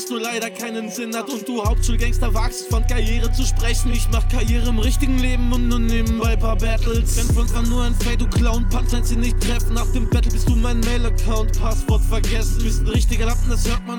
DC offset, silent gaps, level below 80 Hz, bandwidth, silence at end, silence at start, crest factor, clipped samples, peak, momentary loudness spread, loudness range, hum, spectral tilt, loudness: under 0.1%; none; -18 dBFS; 16.5 kHz; 0 s; 0 s; 10 dB; under 0.1%; -6 dBFS; 3 LU; 2 LU; none; -5 dB/octave; -21 LUFS